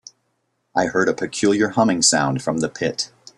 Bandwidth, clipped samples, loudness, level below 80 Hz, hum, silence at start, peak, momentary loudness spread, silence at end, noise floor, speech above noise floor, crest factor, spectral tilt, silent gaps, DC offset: 12.5 kHz; under 0.1%; -19 LUFS; -58 dBFS; none; 0.75 s; -2 dBFS; 8 LU; 0.3 s; -70 dBFS; 51 dB; 18 dB; -3.5 dB/octave; none; under 0.1%